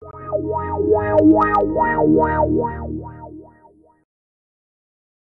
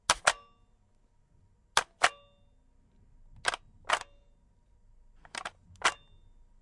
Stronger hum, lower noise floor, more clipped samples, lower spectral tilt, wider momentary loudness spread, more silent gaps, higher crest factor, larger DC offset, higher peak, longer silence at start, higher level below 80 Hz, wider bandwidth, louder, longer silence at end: neither; second, -52 dBFS vs -66 dBFS; neither; first, -10.5 dB/octave vs 0.5 dB/octave; about the same, 17 LU vs 16 LU; neither; second, 16 dB vs 30 dB; neither; about the same, -4 dBFS vs -6 dBFS; about the same, 0 s vs 0.1 s; first, -38 dBFS vs -60 dBFS; second, 3.9 kHz vs 11.5 kHz; first, -17 LUFS vs -31 LUFS; first, 1.85 s vs 0.65 s